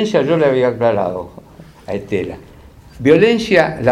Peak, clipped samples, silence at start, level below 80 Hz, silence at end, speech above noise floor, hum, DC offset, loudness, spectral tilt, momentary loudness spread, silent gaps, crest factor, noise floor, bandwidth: 0 dBFS; under 0.1%; 0 s; -46 dBFS; 0 s; 25 dB; none; under 0.1%; -15 LUFS; -6.5 dB/octave; 16 LU; none; 16 dB; -40 dBFS; 12 kHz